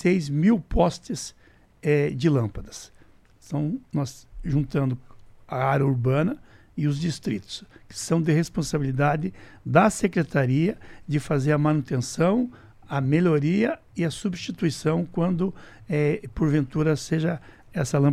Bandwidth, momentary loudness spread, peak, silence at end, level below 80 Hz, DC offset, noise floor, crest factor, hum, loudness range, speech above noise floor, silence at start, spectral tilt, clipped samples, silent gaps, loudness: 13 kHz; 12 LU; -4 dBFS; 0 s; -44 dBFS; under 0.1%; -53 dBFS; 20 dB; none; 4 LU; 29 dB; 0 s; -6.5 dB/octave; under 0.1%; none; -25 LUFS